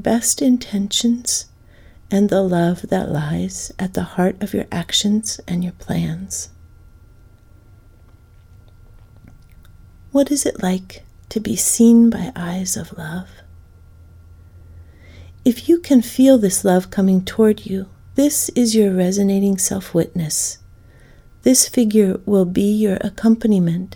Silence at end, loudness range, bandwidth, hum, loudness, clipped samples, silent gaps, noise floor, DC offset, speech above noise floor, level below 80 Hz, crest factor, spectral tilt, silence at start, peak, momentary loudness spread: 0 s; 10 LU; 19 kHz; none; -17 LUFS; under 0.1%; none; -46 dBFS; under 0.1%; 30 dB; -46 dBFS; 18 dB; -4.5 dB/octave; 0 s; 0 dBFS; 12 LU